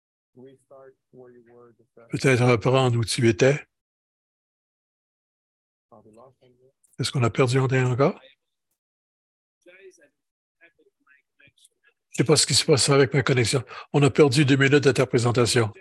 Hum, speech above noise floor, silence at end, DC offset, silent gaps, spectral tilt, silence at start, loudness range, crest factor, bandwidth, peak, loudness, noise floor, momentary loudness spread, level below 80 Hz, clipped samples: none; 42 dB; 0.1 s; under 0.1%; 3.81-5.89 s, 8.78-9.61 s, 10.31-10.55 s; -5 dB/octave; 0.45 s; 11 LU; 20 dB; 12.5 kHz; -4 dBFS; -21 LUFS; -63 dBFS; 9 LU; -56 dBFS; under 0.1%